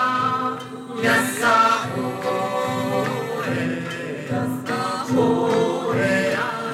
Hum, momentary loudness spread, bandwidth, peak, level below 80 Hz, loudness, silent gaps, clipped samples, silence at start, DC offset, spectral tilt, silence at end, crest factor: none; 9 LU; 16.5 kHz; -6 dBFS; -64 dBFS; -21 LUFS; none; under 0.1%; 0 s; under 0.1%; -5 dB/octave; 0 s; 16 dB